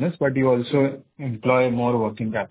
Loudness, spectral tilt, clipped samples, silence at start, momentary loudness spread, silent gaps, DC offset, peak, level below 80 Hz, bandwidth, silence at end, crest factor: -22 LUFS; -11.5 dB/octave; under 0.1%; 0 s; 7 LU; none; under 0.1%; -4 dBFS; -58 dBFS; 4 kHz; 0.05 s; 18 dB